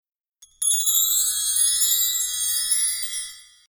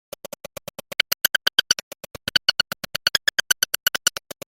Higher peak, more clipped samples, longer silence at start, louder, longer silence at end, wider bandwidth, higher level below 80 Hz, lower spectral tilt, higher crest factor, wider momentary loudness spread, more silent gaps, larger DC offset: second, -6 dBFS vs 0 dBFS; neither; second, 0.6 s vs 1.6 s; about the same, -19 LUFS vs -21 LUFS; second, 0.25 s vs 0.45 s; first, over 20 kHz vs 17 kHz; about the same, -62 dBFS vs -60 dBFS; second, 6 dB/octave vs 1 dB/octave; second, 18 dB vs 24 dB; second, 9 LU vs 18 LU; second, none vs 1.83-1.91 s; neither